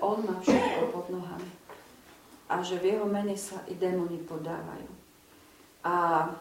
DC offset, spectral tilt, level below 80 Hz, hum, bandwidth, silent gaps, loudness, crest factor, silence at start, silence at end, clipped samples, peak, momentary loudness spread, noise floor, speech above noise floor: under 0.1%; -5.5 dB/octave; -66 dBFS; none; 16.5 kHz; none; -30 LUFS; 20 dB; 0 s; 0 s; under 0.1%; -12 dBFS; 19 LU; -57 dBFS; 27 dB